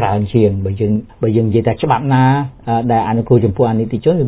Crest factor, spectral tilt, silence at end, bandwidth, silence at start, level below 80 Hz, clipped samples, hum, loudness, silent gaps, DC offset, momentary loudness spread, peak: 14 dB; -12.5 dB/octave; 0 s; 4 kHz; 0 s; -36 dBFS; under 0.1%; none; -15 LUFS; none; under 0.1%; 6 LU; 0 dBFS